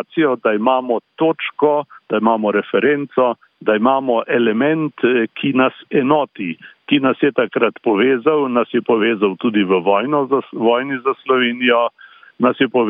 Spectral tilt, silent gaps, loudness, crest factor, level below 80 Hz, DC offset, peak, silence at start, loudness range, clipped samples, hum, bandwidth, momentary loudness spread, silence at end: -9.5 dB/octave; none; -17 LUFS; 14 dB; -66 dBFS; under 0.1%; -2 dBFS; 0 s; 1 LU; under 0.1%; none; 3.9 kHz; 4 LU; 0 s